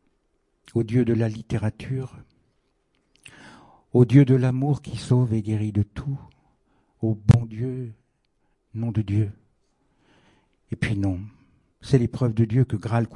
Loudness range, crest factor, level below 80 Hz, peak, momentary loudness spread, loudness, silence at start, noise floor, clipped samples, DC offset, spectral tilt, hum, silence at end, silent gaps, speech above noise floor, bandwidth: 8 LU; 24 dB; -50 dBFS; -2 dBFS; 15 LU; -23 LUFS; 0.75 s; -70 dBFS; under 0.1%; under 0.1%; -8.5 dB/octave; none; 0 s; none; 48 dB; 10.5 kHz